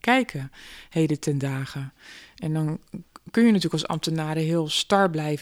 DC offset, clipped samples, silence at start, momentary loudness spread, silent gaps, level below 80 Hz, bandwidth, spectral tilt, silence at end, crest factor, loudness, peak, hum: under 0.1%; under 0.1%; 0.05 s; 19 LU; none; -58 dBFS; 16 kHz; -5.5 dB/octave; 0 s; 18 dB; -24 LUFS; -6 dBFS; none